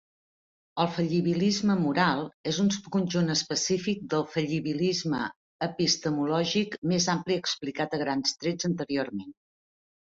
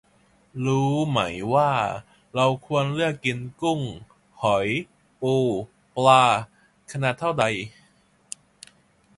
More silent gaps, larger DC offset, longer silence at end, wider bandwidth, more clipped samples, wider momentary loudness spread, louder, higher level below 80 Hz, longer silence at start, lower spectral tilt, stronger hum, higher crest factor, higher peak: first, 2.34-2.44 s, 5.36-5.59 s, 6.78-6.82 s vs none; neither; second, 0.8 s vs 1.5 s; second, 7.8 kHz vs 11.5 kHz; neither; second, 6 LU vs 19 LU; second, -28 LUFS vs -23 LUFS; second, -66 dBFS vs -58 dBFS; first, 0.75 s vs 0.55 s; about the same, -4.5 dB/octave vs -5.5 dB/octave; neither; about the same, 20 dB vs 22 dB; second, -8 dBFS vs -2 dBFS